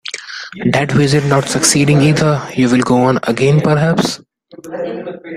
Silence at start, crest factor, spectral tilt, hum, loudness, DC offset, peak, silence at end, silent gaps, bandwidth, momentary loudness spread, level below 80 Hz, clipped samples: 0.05 s; 14 dB; -5 dB/octave; none; -13 LUFS; under 0.1%; 0 dBFS; 0 s; none; 14.5 kHz; 14 LU; -46 dBFS; under 0.1%